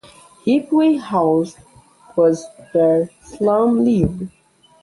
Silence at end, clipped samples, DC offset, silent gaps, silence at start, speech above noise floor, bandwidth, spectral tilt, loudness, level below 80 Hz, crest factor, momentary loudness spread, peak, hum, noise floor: 0.55 s; under 0.1%; under 0.1%; none; 0.45 s; 31 dB; 11.5 kHz; -7.5 dB/octave; -18 LUFS; -46 dBFS; 16 dB; 11 LU; -2 dBFS; none; -48 dBFS